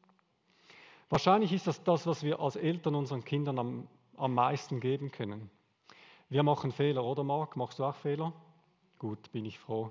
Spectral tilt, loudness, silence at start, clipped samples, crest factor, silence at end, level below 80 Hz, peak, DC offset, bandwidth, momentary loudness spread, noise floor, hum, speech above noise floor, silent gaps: -7 dB/octave; -33 LUFS; 1.1 s; under 0.1%; 22 dB; 0 s; -70 dBFS; -12 dBFS; under 0.1%; 7.6 kHz; 12 LU; -71 dBFS; none; 38 dB; none